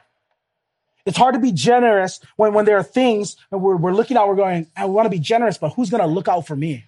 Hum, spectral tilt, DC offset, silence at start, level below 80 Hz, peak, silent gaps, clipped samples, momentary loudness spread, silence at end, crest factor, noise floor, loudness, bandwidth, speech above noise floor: none; -5.5 dB/octave; under 0.1%; 1.05 s; -66 dBFS; -2 dBFS; none; under 0.1%; 8 LU; 0.05 s; 16 dB; -77 dBFS; -18 LUFS; 11.5 kHz; 60 dB